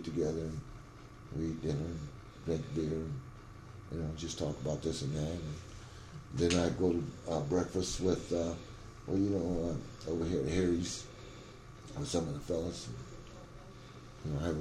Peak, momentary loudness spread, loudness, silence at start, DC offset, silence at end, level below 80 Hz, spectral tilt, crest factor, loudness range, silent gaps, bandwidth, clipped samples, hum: -16 dBFS; 19 LU; -36 LUFS; 0 s; under 0.1%; 0 s; -52 dBFS; -6 dB/octave; 20 dB; 6 LU; none; 13 kHz; under 0.1%; none